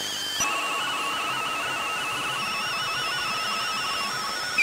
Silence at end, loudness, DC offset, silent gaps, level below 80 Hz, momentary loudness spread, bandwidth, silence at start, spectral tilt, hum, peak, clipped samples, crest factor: 0 s; -26 LUFS; under 0.1%; none; -62 dBFS; 2 LU; 16 kHz; 0 s; -0.5 dB/octave; none; -12 dBFS; under 0.1%; 16 dB